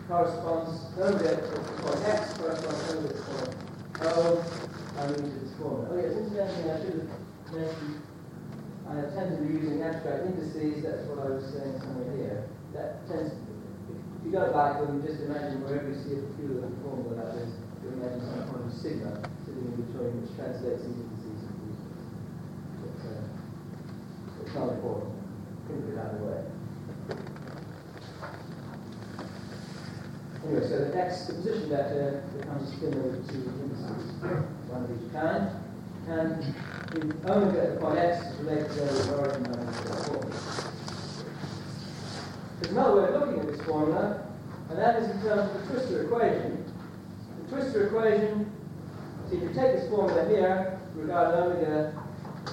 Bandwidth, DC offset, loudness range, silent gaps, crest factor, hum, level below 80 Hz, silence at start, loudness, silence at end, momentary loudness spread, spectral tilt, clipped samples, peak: 16.5 kHz; under 0.1%; 10 LU; none; 20 dB; none; -60 dBFS; 0 s; -31 LUFS; 0 s; 15 LU; -7 dB/octave; under 0.1%; -10 dBFS